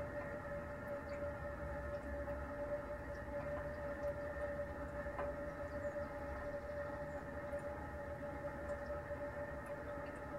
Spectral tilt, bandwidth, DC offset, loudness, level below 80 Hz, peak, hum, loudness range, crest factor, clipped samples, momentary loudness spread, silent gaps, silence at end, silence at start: -7.5 dB/octave; 15.5 kHz; under 0.1%; -46 LUFS; -56 dBFS; -32 dBFS; none; 1 LU; 14 dB; under 0.1%; 3 LU; none; 0 s; 0 s